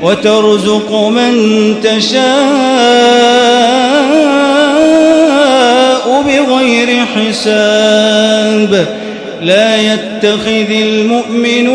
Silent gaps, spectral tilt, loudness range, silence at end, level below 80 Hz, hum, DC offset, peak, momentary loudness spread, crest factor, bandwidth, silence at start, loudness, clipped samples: none; -4 dB/octave; 3 LU; 0 s; -50 dBFS; none; under 0.1%; 0 dBFS; 5 LU; 8 dB; 11 kHz; 0 s; -8 LUFS; 0.9%